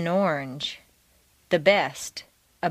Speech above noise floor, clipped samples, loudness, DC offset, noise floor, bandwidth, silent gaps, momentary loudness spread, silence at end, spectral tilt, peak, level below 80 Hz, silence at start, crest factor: 38 dB; under 0.1%; -25 LUFS; under 0.1%; -62 dBFS; 15.5 kHz; none; 17 LU; 0 s; -4.5 dB/octave; -4 dBFS; -64 dBFS; 0 s; 22 dB